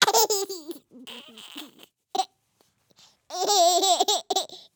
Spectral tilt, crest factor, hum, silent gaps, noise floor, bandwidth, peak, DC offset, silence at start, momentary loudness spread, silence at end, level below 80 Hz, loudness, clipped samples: 0.5 dB/octave; 26 dB; none; none; -68 dBFS; over 20 kHz; -2 dBFS; under 0.1%; 0 s; 22 LU; 0.2 s; -82 dBFS; -23 LUFS; under 0.1%